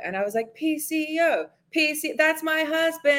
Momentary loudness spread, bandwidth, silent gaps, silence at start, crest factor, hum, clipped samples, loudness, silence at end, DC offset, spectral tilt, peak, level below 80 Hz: 6 LU; 17 kHz; none; 0 s; 18 dB; none; under 0.1%; -24 LUFS; 0 s; under 0.1%; -2.5 dB/octave; -6 dBFS; -76 dBFS